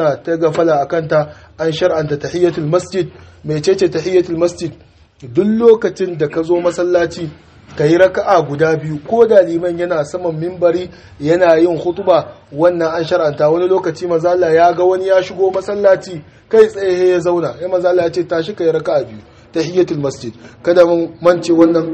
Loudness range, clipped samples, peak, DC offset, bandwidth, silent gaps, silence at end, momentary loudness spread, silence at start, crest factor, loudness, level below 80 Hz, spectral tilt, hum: 3 LU; 0.2%; 0 dBFS; under 0.1%; 8.8 kHz; none; 0 s; 10 LU; 0 s; 14 dB; -14 LUFS; -50 dBFS; -6.5 dB/octave; none